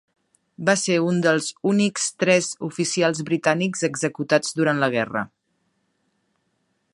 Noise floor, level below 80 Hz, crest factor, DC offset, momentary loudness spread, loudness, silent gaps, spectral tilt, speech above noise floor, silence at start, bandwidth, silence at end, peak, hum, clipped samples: -71 dBFS; -70 dBFS; 20 dB; under 0.1%; 7 LU; -22 LUFS; none; -4 dB/octave; 50 dB; 0.6 s; 11.5 kHz; 1.65 s; -2 dBFS; none; under 0.1%